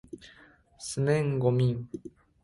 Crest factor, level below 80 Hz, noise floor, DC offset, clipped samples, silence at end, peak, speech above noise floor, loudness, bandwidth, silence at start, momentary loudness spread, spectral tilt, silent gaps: 18 dB; -58 dBFS; -58 dBFS; under 0.1%; under 0.1%; 0.35 s; -12 dBFS; 30 dB; -28 LUFS; 11.5 kHz; 0.15 s; 21 LU; -6.5 dB/octave; none